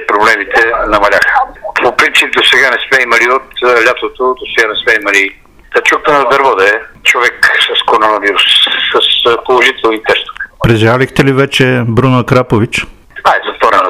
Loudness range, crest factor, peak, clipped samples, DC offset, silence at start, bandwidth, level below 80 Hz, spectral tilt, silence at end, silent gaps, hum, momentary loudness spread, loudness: 2 LU; 10 dB; 0 dBFS; 0.4%; 0.3%; 0 s; 16.5 kHz; -36 dBFS; -4 dB/octave; 0 s; none; none; 6 LU; -8 LUFS